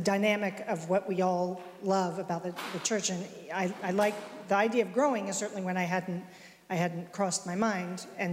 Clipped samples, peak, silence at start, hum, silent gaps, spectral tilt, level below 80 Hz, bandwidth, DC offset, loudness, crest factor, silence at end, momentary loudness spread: under 0.1%; -16 dBFS; 0 s; none; none; -4.5 dB/octave; -76 dBFS; 16 kHz; under 0.1%; -31 LUFS; 16 dB; 0 s; 9 LU